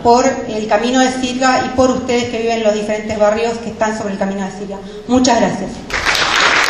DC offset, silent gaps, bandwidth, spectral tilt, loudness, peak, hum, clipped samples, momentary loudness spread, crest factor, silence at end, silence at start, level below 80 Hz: under 0.1%; none; 13 kHz; -3.5 dB/octave; -15 LUFS; 0 dBFS; none; under 0.1%; 9 LU; 14 dB; 0 s; 0 s; -40 dBFS